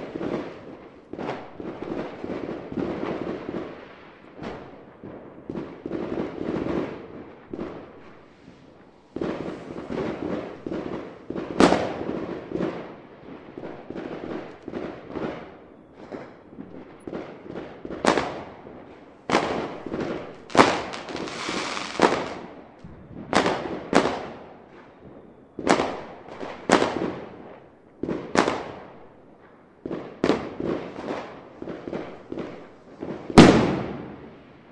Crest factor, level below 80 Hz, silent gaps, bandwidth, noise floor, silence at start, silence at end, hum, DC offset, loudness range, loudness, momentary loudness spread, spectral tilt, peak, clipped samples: 28 dB; -50 dBFS; none; 11.5 kHz; -52 dBFS; 0 s; 0 s; none; under 0.1%; 11 LU; -26 LUFS; 22 LU; -5.5 dB/octave; 0 dBFS; under 0.1%